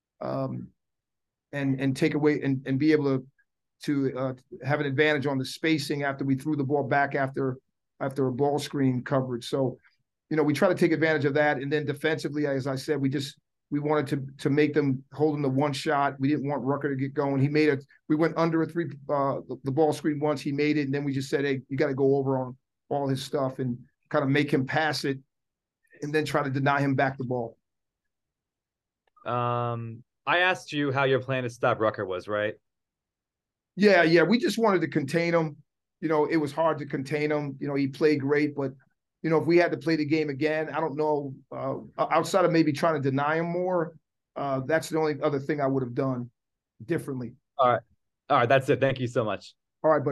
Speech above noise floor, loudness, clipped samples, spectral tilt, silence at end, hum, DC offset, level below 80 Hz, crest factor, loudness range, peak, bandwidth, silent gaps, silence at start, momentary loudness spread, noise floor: 63 dB; -26 LUFS; under 0.1%; -6.5 dB/octave; 0 s; none; under 0.1%; -68 dBFS; 20 dB; 4 LU; -8 dBFS; 12.5 kHz; none; 0.2 s; 10 LU; -89 dBFS